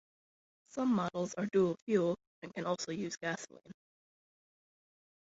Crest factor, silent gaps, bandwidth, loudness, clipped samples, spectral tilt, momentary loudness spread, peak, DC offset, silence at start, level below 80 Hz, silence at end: 18 dB; 1.82-1.87 s, 2.27-2.42 s; 8 kHz; -35 LUFS; under 0.1%; -5.5 dB/octave; 12 LU; -18 dBFS; under 0.1%; 0.75 s; -76 dBFS; 1.5 s